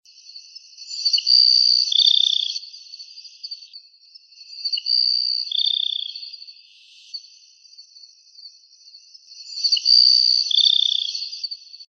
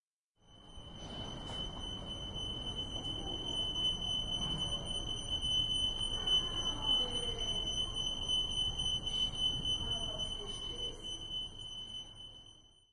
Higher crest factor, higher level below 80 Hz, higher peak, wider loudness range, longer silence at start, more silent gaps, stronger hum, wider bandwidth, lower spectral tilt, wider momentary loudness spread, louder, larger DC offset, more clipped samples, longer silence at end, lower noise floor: about the same, 20 dB vs 16 dB; second, under -90 dBFS vs -48 dBFS; first, -2 dBFS vs -22 dBFS; first, 11 LU vs 7 LU; second, 0.35 s vs 0.5 s; neither; neither; second, 7.6 kHz vs 11.5 kHz; second, 11 dB/octave vs -2.5 dB/octave; first, 25 LU vs 13 LU; first, -16 LUFS vs -35 LUFS; neither; neither; second, 0.05 s vs 0.25 s; second, -50 dBFS vs -70 dBFS